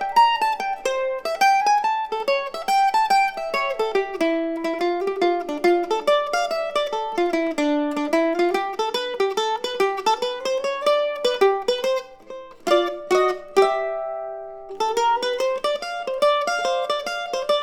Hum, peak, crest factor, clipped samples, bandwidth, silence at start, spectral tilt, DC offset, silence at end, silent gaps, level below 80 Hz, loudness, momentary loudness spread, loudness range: none; -4 dBFS; 18 dB; under 0.1%; 17.5 kHz; 0 s; -2.5 dB/octave; under 0.1%; 0 s; none; -60 dBFS; -22 LUFS; 7 LU; 2 LU